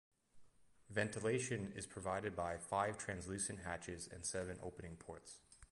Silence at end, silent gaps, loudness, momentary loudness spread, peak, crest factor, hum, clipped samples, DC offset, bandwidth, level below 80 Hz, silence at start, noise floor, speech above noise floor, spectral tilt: 0.05 s; none; -44 LUFS; 14 LU; -24 dBFS; 22 dB; none; under 0.1%; under 0.1%; 11.5 kHz; -64 dBFS; 0.35 s; -65 dBFS; 21 dB; -4 dB/octave